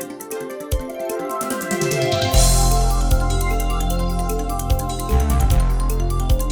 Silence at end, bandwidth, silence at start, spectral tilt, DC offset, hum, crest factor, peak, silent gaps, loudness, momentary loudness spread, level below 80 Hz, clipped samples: 0 s; over 20 kHz; 0 s; -4.5 dB/octave; under 0.1%; none; 16 dB; -2 dBFS; none; -21 LUFS; 10 LU; -20 dBFS; under 0.1%